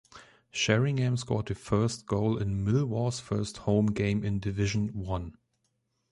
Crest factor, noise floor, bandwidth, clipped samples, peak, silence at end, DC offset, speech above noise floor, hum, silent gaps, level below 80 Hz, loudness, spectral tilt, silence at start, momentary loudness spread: 20 dB; -77 dBFS; 11.5 kHz; under 0.1%; -10 dBFS; 0.8 s; under 0.1%; 48 dB; none; none; -48 dBFS; -29 LUFS; -6 dB/octave; 0.15 s; 7 LU